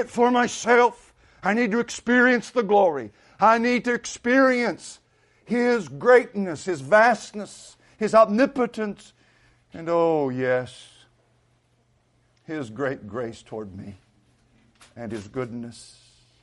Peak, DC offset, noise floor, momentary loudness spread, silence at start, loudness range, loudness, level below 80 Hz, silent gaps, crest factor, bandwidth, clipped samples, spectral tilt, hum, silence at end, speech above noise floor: -4 dBFS; under 0.1%; -65 dBFS; 19 LU; 0 s; 14 LU; -22 LUFS; -64 dBFS; none; 18 dB; 11.5 kHz; under 0.1%; -5 dB/octave; none; 0.6 s; 43 dB